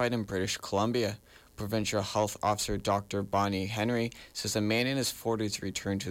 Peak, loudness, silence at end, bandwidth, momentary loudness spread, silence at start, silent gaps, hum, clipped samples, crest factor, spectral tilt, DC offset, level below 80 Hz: -18 dBFS; -31 LUFS; 0 s; 17 kHz; 6 LU; 0 s; none; none; under 0.1%; 14 dB; -4.5 dB/octave; under 0.1%; -56 dBFS